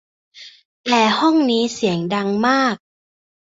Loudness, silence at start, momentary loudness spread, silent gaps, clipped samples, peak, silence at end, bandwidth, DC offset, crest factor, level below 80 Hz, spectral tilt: -17 LUFS; 0.35 s; 6 LU; 0.65-0.84 s; under 0.1%; -2 dBFS; 0.65 s; 8 kHz; under 0.1%; 18 dB; -62 dBFS; -4.5 dB/octave